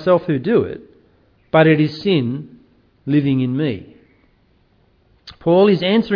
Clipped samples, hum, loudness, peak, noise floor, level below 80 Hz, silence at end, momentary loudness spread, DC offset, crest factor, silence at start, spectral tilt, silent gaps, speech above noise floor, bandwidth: under 0.1%; none; -17 LUFS; -2 dBFS; -57 dBFS; -54 dBFS; 0 s; 15 LU; under 0.1%; 16 dB; 0 s; -9 dB/octave; none; 41 dB; 5.4 kHz